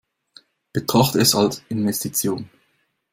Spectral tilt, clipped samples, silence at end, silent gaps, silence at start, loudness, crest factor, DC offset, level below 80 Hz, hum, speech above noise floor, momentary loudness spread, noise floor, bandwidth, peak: -4 dB/octave; under 0.1%; 0.65 s; none; 0.75 s; -20 LUFS; 20 dB; under 0.1%; -54 dBFS; none; 47 dB; 14 LU; -67 dBFS; 16.5 kHz; -2 dBFS